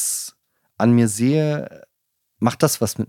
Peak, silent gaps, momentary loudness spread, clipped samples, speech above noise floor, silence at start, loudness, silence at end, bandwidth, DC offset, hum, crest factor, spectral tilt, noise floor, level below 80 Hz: 0 dBFS; none; 11 LU; under 0.1%; 56 dB; 0 s; -19 LUFS; 0.05 s; 17 kHz; under 0.1%; none; 20 dB; -5.5 dB/octave; -74 dBFS; -62 dBFS